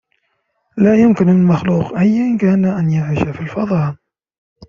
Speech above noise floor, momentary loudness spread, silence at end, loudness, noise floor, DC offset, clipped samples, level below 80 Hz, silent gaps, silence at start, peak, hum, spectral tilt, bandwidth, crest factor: 53 dB; 9 LU; 0.75 s; -14 LUFS; -67 dBFS; under 0.1%; under 0.1%; -48 dBFS; none; 0.75 s; -2 dBFS; none; -9.5 dB/octave; 7 kHz; 14 dB